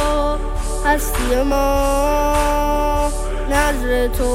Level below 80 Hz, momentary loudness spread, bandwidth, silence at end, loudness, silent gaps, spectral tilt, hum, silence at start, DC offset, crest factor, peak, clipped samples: -22 dBFS; 5 LU; 16.5 kHz; 0 s; -18 LUFS; none; -4.5 dB/octave; none; 0 s; under 0.1%; 14 dB; -2 dBFS; under 0.1%